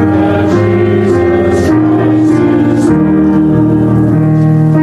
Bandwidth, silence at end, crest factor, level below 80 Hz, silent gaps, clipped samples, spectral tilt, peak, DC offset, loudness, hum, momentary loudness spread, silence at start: 10.5 kHz; 0 s; 8 dB; -32 dBFS; none; under 0.1%; -9 dB/octave; 0 dBFS; under 0.1%; -9 LUFS; none; 1 LU; 0 s